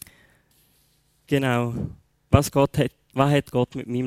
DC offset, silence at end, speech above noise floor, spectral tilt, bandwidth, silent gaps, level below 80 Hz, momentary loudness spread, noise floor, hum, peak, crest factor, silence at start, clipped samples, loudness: under 0.1%; 0 s; 42 dB; -6.5 dB/octave; 16 kHz; none; -44 dBFS; 8 LU; -64 dBFS; none; -2 dBFS; 24 dB; 1.3 s; under 0.1%; -23 LUFS